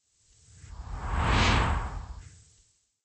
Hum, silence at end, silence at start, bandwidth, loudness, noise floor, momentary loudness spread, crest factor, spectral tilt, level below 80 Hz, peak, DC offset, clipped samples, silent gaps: none; 0.75 s; 0.65 s; 8.4 kHz; -28 LUFS; -66 dBFS; 23 LU; 20 dB; -4.5 dB/octave; -34 dBFS; -12 dBFS; under 0.1%; under 0.1%; none